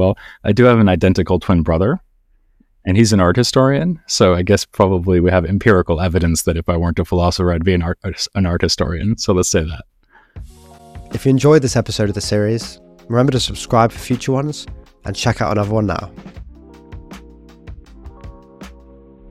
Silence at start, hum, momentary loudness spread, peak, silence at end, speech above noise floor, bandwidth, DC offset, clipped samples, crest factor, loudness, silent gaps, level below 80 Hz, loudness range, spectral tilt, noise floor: 0 s; none; 13 LU; 0 dBFS; 0.55 s; 40 dB; 15 kHz; under 0.1%; under 0.1%; 16 dB; -16 LUFS; none; -34 dBFS; 7 LU; -5.5 dB/octave; -55 dBFS